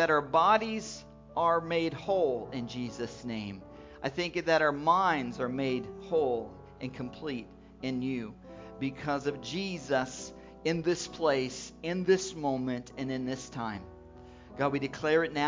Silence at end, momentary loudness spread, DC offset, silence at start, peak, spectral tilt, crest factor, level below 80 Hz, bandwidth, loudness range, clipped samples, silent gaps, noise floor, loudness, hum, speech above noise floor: 0 s; 16 LU; under 0.1%; 0 s; -12 dBFS; -5 dB/octave; 20 dB; -58 dBFS; 7.6 kHz; 5 LU; under 0.1%; none; -51 dBFS; -31 LUFS; none; 20 dB